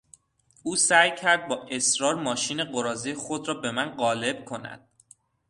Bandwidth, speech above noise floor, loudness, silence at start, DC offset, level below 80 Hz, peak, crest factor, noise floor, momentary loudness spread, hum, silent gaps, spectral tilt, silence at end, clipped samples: 11.5 kHz; 37 dB; -25 LUFS; 0.65 s; under 0.1%; -68 dBFS; -4 dBFS; 24 dB; -63 dBFS; 14 LU; none; none; -1.5 dB/octave; 0.7 s; under 0.1%